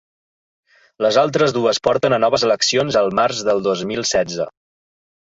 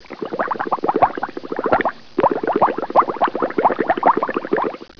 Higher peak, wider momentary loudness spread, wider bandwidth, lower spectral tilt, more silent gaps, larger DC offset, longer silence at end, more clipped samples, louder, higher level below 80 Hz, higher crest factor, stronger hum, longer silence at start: about the same, -2 dBFS vs 0 dBFS; second, 5 LU vs 8 LU; first, 8 kHz vs 5.4 kHz; second, -3.5 dB/octave vs -7.5 dB/octave; neither; second, under 0.1% vs 1%; first, 0.8 s vs 0.1 s; neither; about the same, -17 LUFS vs -19 LUFS; about the same, -54 dBFS vs -52 dBFS; about the same, 16 dB vs 18 dB; neither; first, 1 s vs 0 s